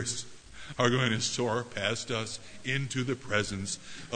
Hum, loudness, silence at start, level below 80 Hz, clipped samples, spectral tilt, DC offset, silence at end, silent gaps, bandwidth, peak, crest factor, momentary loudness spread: none; -31 LUFS; 0 s; -58 dBFS; under 0.1%; -3.5 dB/octave; under 0.1%; 0 s; none; 9.6 kHz; -10 dBFS; 22 dB; 11 LU